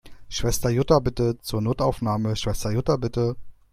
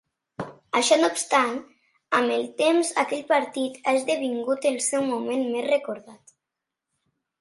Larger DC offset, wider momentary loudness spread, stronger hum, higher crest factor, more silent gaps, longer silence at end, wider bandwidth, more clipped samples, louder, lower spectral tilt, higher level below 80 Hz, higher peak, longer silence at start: neither; second, 7 LU vs 15 LU; neither; about the same, 20 dB vs 18 dB; neither; second, 0.2 s vs 1.25 s; first, 16 kHz vs 11.5 kHz; neither; about the same, -24 LUFS vs -24 LUFS; first, -6 dB/octave vs -2.5 dB/octave; first, -38 dBFS vs -76 dBFS; about the same, -4 dBFS vs -6 dBFS; second, 0.05 s vs 0.4 s